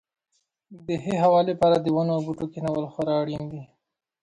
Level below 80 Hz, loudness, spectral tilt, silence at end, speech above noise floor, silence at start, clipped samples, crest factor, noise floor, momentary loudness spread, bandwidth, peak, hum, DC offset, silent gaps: -60 dBFS; -24 LUFS; -8 dB/octave; 0.6 s; 51 dB; 0.7 s; under 0.1%; 16 dB; -74 dBFS; 14 LU; 11 kHz; -8 dBFS; none; under 0.1%; none